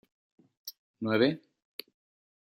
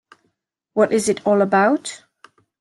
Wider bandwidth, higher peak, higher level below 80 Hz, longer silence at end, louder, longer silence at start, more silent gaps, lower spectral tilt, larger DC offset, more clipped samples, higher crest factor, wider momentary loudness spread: first, 16 kHz vs 12.5 kHz; second, -10 dBFS vs -4 dBFS; second, -78 dBFS vs -64 dBFS; first, 1.05 s vs 0.65 s; second, -29 LUFS vs -18 LUFS; about the same, 0.65 s vs 0.75 s; first, 0.79-0.94 s vs none; about the same, -6 dB/octave vs -5 dB/octave; neither; neither; first, 24 dB vs 16 dB; first, 19 LU vs 14 LU